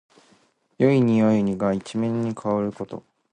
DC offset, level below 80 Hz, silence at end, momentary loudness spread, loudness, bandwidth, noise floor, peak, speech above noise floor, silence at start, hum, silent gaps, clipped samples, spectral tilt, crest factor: under 0.1%; -58 dBFS; 0.35 s; 15 LU; -22 LUFS; 9.6 kHz; -61 dBFS; -6 dBFS; 40 dB; 0.8 s; none; none; under 0.1%; -8 dB/octave; 18 dB